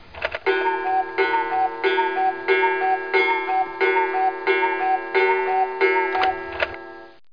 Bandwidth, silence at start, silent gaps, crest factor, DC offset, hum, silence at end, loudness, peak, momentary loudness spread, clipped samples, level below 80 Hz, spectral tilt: 5.2 kHz; 0.15 s; none; 16 dB; 0.4%; none; 0.25 s; -21 LUFS; -6 dBFS; 6 LU; under 0.1%; -56 dBFS; -5 dB/octave